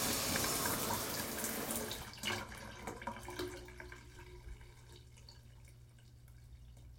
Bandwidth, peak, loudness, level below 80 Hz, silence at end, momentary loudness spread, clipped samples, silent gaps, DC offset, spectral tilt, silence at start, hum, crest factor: 17 kHz; -20 dBFS; -39 LUFS; -58 dBFS; 0 s; 25 LU; under 0.1%; none; under 0.1%; -2.5 dB/octave; 0 s; none; 22 dB